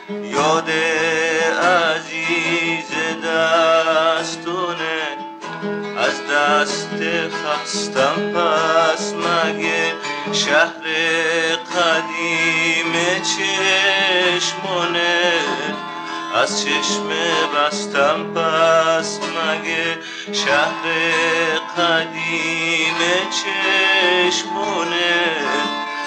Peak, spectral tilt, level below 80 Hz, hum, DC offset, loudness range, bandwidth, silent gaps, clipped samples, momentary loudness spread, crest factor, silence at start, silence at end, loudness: -4 dBFS; -2.5 dB/octave; -78 dBFS; none; under 0.1%; 3 LU; 11 kHz; none; under 0.1%; 7 LU; 16 dB; 0 s; 0 s; -17 LUFS